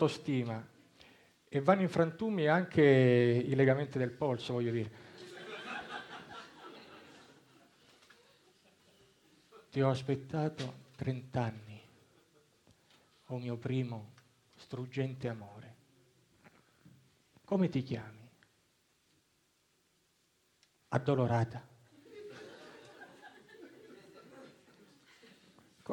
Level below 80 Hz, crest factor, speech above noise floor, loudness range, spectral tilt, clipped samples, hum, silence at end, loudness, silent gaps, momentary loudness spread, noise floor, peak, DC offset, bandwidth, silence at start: -72 dBFS; 24 dB; 42 dB; 20 LU; -7.5 dB/octave; under 0.1%; none; 0 s; -33 LUFS; none; 26 LU; -74 dBFS; -12 dBFS; under 0.1%; 10.5 kHz; 0 s